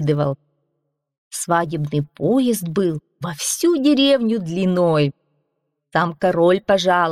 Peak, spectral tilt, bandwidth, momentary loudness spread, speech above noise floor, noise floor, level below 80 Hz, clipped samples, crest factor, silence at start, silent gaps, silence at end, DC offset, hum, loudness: -6 dBFS; -5 dB/octave; 15.5 kHz; 9 LU; 56 dB; -74 dBFS; -58 dBFS; under 0.1%; 14 dB; 0 s; 1.18-1.31 s; 0 s; under 0.1%; none; -19 LUFS